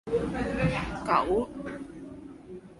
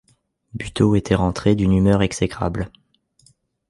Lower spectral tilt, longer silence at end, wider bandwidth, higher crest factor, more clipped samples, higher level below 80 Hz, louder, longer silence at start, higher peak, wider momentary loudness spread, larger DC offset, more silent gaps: about the same, -7 dB/octave vs -6.5 dB/octave; second, 0 s vs 1 s; about the same, 11.5 kHz vs 11.5 kHz; about the same, 20 dB vs 18 dB; neither; second, -46 dBFS vs -36 dBFS; second, -29 LUFS vs -19 LUFS; second, 0.05 s vs 0.55 s; second, -12 dBFS vs -2 dBFS; first, 19 LU vs 15 LU; neither; neither